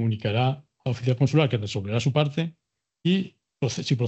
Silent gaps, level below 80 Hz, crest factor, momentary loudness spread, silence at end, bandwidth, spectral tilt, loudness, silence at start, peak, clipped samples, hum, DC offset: none; -66 dBFS; 18 dB; 9 LU; 0 s; 8.4 kHz; -6.5 dB/octave; -25 LUFS; 0 s; -6 dBFS; under 0.1%; none; under 0.1%